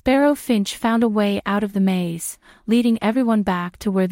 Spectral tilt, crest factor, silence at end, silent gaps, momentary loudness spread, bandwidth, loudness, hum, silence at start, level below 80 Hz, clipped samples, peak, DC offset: -6 dB/octave; 14 dB; 0 s; none; 7 LU; 16.5 kHz; -20 LUFS; none; 0.05 s; -50 dBFS; under 0.1%; -6 dBFS; under 0.1%